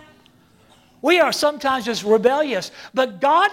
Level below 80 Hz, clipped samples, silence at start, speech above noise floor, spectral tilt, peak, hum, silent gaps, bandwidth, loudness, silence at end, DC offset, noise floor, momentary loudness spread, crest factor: -62 dBFS; under 0.1%; 1.05 s; 35 dB; -3.5 dB/octave; -4 dBFS; none; none; 16.5 kHz; -19 LUFS; 0 s; under 0.1%; -54 dBFS; 8 LU; 16 dB